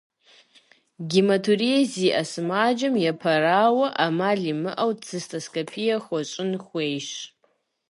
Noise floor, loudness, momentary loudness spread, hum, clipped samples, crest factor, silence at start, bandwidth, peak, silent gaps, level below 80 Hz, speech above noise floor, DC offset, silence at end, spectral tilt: -68 dBFS; -23 LUFS; 11 LU; none; under 0.1%; 18 dB; 1 s; 11.5 kHz; -6 dBFS; none; -74 dBFS; 45 dB; under 0.1%; 0.65 s; -5 dB/octave